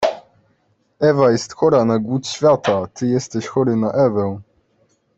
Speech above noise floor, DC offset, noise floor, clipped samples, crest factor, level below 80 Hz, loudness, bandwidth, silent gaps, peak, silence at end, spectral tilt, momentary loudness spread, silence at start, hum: 46 dB; under 0.1%; -62 dBFS; under 0.1%; 16 dB; -56 dBFS; -18 LUFS; 8.2 kHz; none; -2 dBFS; 0.75 s; -6 dB/octave; 8 LU; 0 s; none